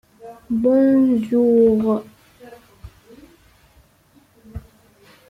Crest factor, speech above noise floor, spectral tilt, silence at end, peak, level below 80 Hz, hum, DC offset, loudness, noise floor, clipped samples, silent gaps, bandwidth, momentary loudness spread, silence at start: 14 dB; 40 dB; -9 dB/octave; 0.7 s; -6 dBFS; -50 dBFS; none; under 0.1%; -17 LUFS; -55 dBFS; under 0.1%; none; 5.4 kHz; 24 LU; 0.25 s